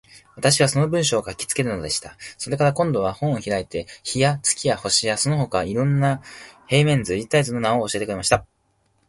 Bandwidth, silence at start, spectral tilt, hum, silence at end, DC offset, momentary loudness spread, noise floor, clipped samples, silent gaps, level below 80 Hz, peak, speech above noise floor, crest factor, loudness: 11.5 kHz; 0.15 s; -4 dB/octave; none; 0.65 s; under 0.1%; 9 LU; -66 dBFS; under 0.1%; none; -50 dBFS; -2 dBFS; 45 dB; 18 dB; -21 LUFS